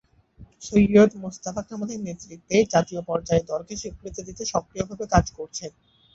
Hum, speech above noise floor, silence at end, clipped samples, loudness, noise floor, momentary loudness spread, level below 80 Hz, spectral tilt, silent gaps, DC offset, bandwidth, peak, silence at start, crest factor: none; 27 dB; 0.45 s; under 0.1%; -24 LUFS; -51 dBFS; 18 LU; -42 dBFS; -5.5 dB/octave; none; under 0.1%; 7.8 kHz; -4 dBFS; 0.4 s; 20 dB